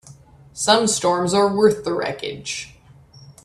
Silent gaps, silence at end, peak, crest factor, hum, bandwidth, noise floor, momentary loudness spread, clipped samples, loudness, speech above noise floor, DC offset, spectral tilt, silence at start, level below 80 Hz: none; 0.15 s; 0 dBFS; 20 dB; none; 13.5 kHz; -48 dBFS; 13 LU; under 0.1%; -19 LUFS; 29 dB; under 0.1%; -3.5 dB/octave; 0.05 s; -56 dBFS